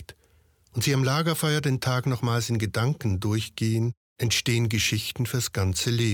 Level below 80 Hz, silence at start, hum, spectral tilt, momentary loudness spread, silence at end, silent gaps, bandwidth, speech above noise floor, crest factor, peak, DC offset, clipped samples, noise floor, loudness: -56 dBFS; 0 s; none; -4.5 dB/octave; 5 LU; 0 s; 3.97-4.16 s; 18.5 kHz; 37 dB; 14 dB; -12 dBFS; under 0.1%; under 0.1%; -62 dBFS; -25 LUFS